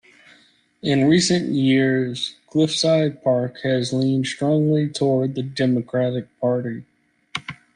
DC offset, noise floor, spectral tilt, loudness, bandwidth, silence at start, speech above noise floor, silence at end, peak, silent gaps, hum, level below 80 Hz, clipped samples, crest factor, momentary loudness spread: under 0.1%; -57 dBFS; -5.5 dB/octave; -20 LUFS; 10.5 kHz; 0.85 s; 37 dB; 0.25 s; -6 dBFS; none; none; -60 dBFS; under 0.1%; 16 dB; 11 LU